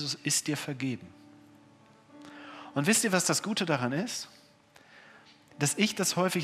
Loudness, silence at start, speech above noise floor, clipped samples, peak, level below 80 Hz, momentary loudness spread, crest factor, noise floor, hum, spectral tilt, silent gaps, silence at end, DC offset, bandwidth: -29 LUFS; 0 s; 30 dB; under 0.1%; -8 dBFS; -80 dBFS; 20 LU; 24 dB; -59 dBFS; none; -3.5 dB/octave; none; 0 s; under 0.1%; 16 kHz